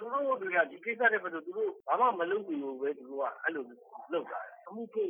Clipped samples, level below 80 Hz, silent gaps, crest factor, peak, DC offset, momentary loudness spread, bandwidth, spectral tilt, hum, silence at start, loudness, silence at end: under 0.1%; under -90 dBFS; none; 20 dB; -14 dBFS; under 0.1%; 14 LU; 3.6 kHz; -7.5 dB/octave; none; 0 s; -33 LUFS; 0 s